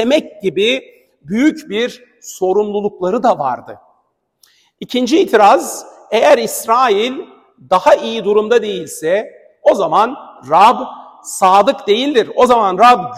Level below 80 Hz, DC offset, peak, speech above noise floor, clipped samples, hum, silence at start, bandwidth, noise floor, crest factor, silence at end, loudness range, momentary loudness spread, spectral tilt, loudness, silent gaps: -56 dBFS; under 0.1%; 0 dBFS; 50 dB; under 0.1%; none; 0 s; 16 kHz; -63 dBFS; 14 dB; 0 s; 5 LU; 14 LU; -4 dB/octave; -13 LUFS; none